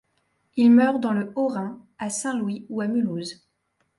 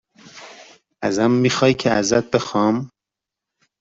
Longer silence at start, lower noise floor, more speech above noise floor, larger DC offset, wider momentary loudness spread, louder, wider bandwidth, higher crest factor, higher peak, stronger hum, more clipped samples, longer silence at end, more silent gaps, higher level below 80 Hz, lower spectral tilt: first, 0.55 s vs 0.35 s; second, -72 dBFS vs -86 dBFS; second, 50 dB vs 68 dB; neither; second, 16 LU vs 22 LU; second, -23 LUFS vs -19 LUFS; first, 11.5 kHz vs 8 kHz; about the same, 16 dB vs 18 dB; second, -8 dBFS vs -2 dBFS; neither; neither; second, 0.65 s vs 0.95 s; neither; second, -70 dBFS vs -56 dBFS; about the same, -5.5 dB/octave vs -5 dB/octave